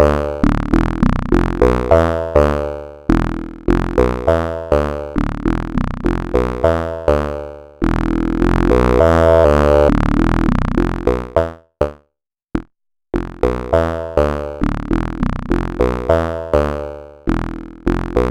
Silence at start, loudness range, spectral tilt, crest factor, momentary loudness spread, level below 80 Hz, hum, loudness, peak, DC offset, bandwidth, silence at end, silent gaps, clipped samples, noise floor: 0 s; 7 LU; -8 dB/octave; 16 dB; 12 LU; -22 dBFS; none; -17 LUFS; 0 dBFS; under 0.1%; 12.5 kHz; 0 s; none; under 0.1%; -73 dBFS